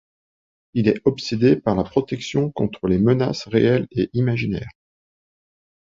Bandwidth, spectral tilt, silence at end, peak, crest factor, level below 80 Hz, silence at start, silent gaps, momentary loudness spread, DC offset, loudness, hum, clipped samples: 7.6 kHz; -7.5 dB/octave; 1.25 s; -4 dBFS; 18 dB; -48 dBFS; 0.75 s; none; 7 LU; under 0.1%; -21 LUFS; none; under 0.1%